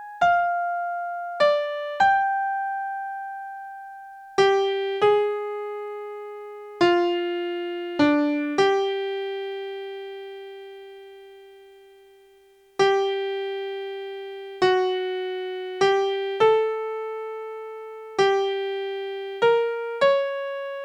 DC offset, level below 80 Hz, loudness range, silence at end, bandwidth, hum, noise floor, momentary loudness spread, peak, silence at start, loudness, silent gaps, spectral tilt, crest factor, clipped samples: under 0.1%; -68 dBFS; 5 LU; 0 s; 9.8 kHz; none; -56 dBFS; 17 LU; -6 dBFS; 0 s; -24 LUFS; none; -4.5 dB/octave; 18 dB; under 0.1%